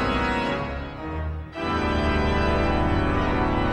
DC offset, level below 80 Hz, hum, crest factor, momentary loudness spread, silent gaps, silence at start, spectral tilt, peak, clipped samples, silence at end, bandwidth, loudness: under 0.1%; -30 dBFS; none; 14 dB; 9 LU; none; 0 s; -7 dB/octave; -10 dBFS; under 0.1%; 0 s; 9.4 kHz; -25 LUFS